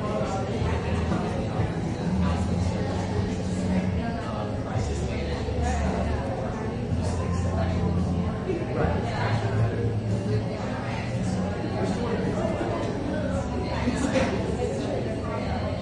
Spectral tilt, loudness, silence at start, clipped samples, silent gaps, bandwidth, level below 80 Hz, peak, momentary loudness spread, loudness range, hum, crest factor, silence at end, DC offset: -7 dB/octave; -27 LUFS; 0 s; under 0.1%; none; 11 kHz; -38 dBFS; -10 dBFS; 4 LU; 1 LU; none; 16 dB; 0 s; under 0.1%